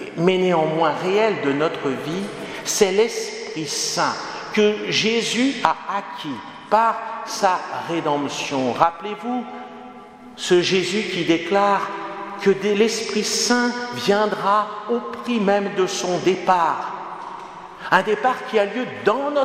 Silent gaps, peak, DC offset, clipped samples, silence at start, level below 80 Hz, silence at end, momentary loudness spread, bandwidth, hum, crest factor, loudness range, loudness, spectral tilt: none; 0 dBFS; under 0.1%; under 0.1%; 0 s; -64 dBFS; 0 s; 12 LU; 16 kHz; none; 20 dB; 2 LU; -21 LUFS; -3.5 dB/octave